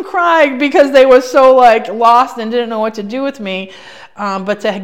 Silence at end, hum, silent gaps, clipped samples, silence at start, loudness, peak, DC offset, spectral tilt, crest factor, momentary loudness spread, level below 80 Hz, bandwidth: 0 s; none; none; 2%; 0 s; -11 LUFS; 0 dBFS; 0.6%; -4.5 dB/octave; 12 dB; 14 LU; -50 dBFS; 13.5 kHz